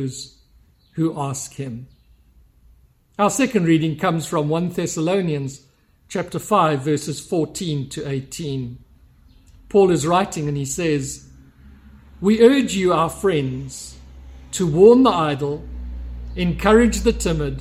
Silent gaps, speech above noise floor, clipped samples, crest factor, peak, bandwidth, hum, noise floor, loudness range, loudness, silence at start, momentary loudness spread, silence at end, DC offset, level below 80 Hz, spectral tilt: none; 36 dB; under 0.1%; 20 dB; 0 dBFS; 15.5 kHz; none; -55 dBFS; 6 LU; -19 LUFS; 0 s; 18 LU; 0 s; under 0.1%; -38 dBFS; -5.5 dB/octave